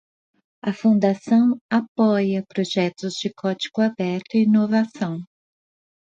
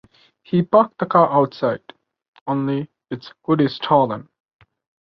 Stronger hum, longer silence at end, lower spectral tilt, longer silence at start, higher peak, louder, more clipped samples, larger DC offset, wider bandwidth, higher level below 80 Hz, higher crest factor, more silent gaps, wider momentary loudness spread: neither; about the same, 0.8 s vs 0.85 s; second, -6.5 dB/octave vs -9.5 dB/octave; first, 0.65 s vs 0.5 s; second, -6 dBFS vs -2 dBFS; about the same, -21 LUFS vs -19 LUFS; neither; neither; first, 7.6 kHz vs 6 kHz; second, -68 dBFS vs -62 dBFS; about the same, 16 dB vs 20 dB; about the same, 1.61-1.69 s, 1.88-1.95 s vs 2.28-2.33 s, 2.41-2.46 s; second, 9 LU vs 16 LU